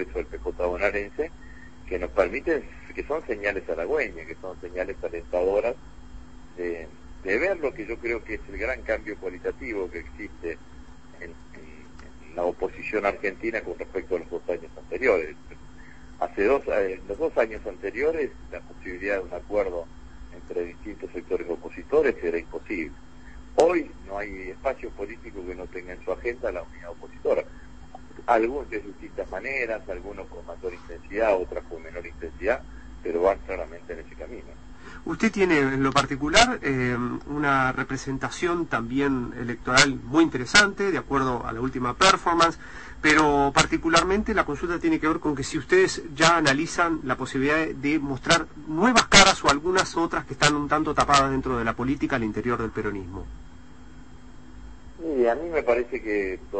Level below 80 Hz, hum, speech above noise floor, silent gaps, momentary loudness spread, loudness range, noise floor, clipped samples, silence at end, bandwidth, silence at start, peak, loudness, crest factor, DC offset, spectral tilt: -44 dBFS; none; 22 dB; none; 18 LU; 11 LU; -47 dBFS; under 0.1%; 0 s; 8.8 kHz; 0 s; -2 dBFS; -24 LUFS; 24 dB; 0.5%; -3.5 dB/octave